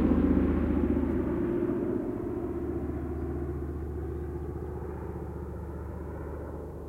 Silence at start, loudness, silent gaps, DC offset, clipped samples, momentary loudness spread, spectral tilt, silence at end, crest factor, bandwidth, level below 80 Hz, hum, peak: 0 s; -32 LUFS; none; under 0.1%; under 0.1%; 12 LU; -10.5 dB/octave; 0 s; 18 dB; 4.2 kHz; -40 dBFS; none; -12 dBFS